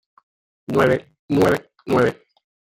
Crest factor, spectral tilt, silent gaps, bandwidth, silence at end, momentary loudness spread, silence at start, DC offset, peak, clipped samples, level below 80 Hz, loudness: 18 dB; -6.5 dB/octave; 1.19-1.28 s; 17 kHz; 0.5 s; 7 LU; 0.7 s; under 0.1%; -2 dBFS; under 0.1%; -52 dBFS; -20 LUFS